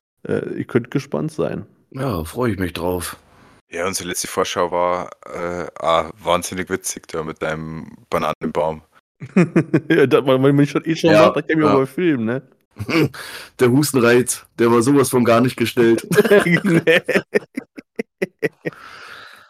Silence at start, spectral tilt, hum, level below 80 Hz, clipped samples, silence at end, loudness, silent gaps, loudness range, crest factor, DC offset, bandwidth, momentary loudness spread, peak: 0.25 s; -5.5 dB/octave; none; -50 dBFS; under 0.1%; 0.2 s; -18 LUFS; 3.61-3.67 s, 8.35-8.41 s, 9.00-9.15 s, 12.65-12.71 s; 8 LU; 18 dB; under 0.1%; 16 kHz; 17 LU; 0 dBFS